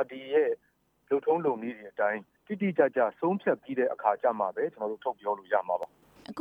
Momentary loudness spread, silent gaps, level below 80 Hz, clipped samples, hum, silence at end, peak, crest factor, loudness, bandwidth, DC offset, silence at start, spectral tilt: 10 LU; none; -78 dBFS; under 0.1%; none; 0 s; -10 dBFS; 20 dB; -30 LUFS; 5.4 kHz; under 0.1%; 0 s; -8.5 dB/octave